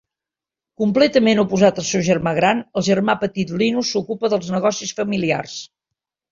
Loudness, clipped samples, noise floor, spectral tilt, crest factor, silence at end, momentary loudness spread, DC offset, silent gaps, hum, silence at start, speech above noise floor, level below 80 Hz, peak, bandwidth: -18 LUFS; under 0.1%; -88 dBFS; -5 dB/octave; 18 dB; 0.65 s; 8 LU; under 0.1%; none; none; 0.8 s; 70 dB; -56 dBFS; -2 dBFS; 7.6 kHz